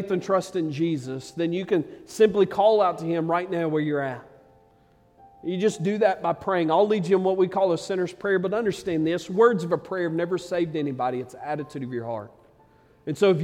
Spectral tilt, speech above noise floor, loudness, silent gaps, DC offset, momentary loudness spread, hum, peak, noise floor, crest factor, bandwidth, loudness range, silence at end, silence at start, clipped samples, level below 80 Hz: -6.5 dB/octave; 35 dB; -24 LUFS; none; under 0.1%; 12 LU; none; -6 dBFS; -59 dBFS; 18 dB; 14 kHz; 5 LU; 0 s; 0 s; under 0.1%; -64 dBFS